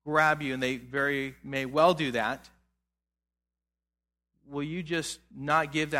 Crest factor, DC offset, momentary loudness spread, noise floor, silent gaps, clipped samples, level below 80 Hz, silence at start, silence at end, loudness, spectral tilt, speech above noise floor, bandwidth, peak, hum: 20 dB; under 0.1%; 13 LU; -90 dBFS; none; under 0.1%; -62 dBFS; 0.05 s; 0 s; -29 LUFS; -4.5 dB/octave; 61 dB; 16.5 kHz; -10 dBFS; 60 Hz at -60 dBFS